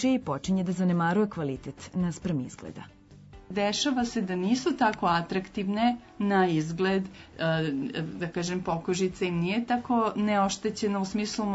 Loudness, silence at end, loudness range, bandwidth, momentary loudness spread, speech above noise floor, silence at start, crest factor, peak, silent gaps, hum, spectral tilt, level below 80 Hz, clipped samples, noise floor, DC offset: -28 LUFS; 0 s; 3 LU; 8 kHz; 8 LU; 22 dB; 0 s; 16 dB; -12 dBFS; none; none; -5.5 dB/octave; -56 dBFS; under 0.1%; -50 dBFS; under 0.1%